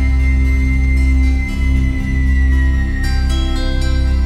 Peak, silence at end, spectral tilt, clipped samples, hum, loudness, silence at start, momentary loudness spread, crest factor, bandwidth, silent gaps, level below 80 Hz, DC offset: -4 dBFS; 0 s; -6.5 dB/octave; under 0.1%; none; -16 LUFS; 0 s; 4 LU; 8 dB; 9 kHz; none; -14 dBFS; under 0.1%